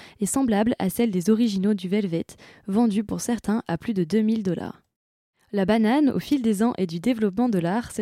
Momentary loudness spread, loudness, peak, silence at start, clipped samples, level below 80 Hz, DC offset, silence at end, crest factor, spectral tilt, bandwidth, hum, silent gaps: 7 LU; -23 LUFS; -8 dBFS; 0 s; under 0.1%; -56 dBFS; under 0.1%; 0 s; 14 dB; -6 dB/octave; 15.5 kHz; none; 4.96-5.33 s